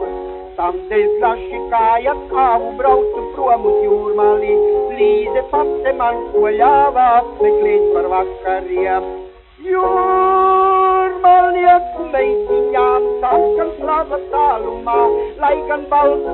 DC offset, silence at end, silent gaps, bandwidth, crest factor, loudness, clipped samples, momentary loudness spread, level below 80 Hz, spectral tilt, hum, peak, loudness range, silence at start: under 0.1%; 0 s; none; 4.2 kHz; 14 dB; -15 LUFS; under 0.1%; 8 LU; -40 dBFS; -3.5 dB/octave; none; 0 dBFS; 3 LU; 0 s